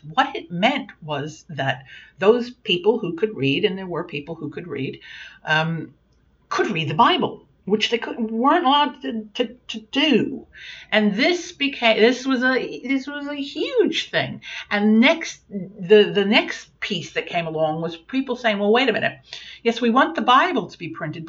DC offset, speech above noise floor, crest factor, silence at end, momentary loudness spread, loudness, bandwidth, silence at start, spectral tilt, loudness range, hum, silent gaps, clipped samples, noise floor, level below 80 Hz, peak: under 0.1%; 38 dB; 18 dB; 0 s; 15 LU; -21 LUFS; 7.6 kHz; 0.05 s; -5 dB/octave; 4 LU; none; none; under 0.1%; -59 dBFS; -62 dBFS; -4 dBFS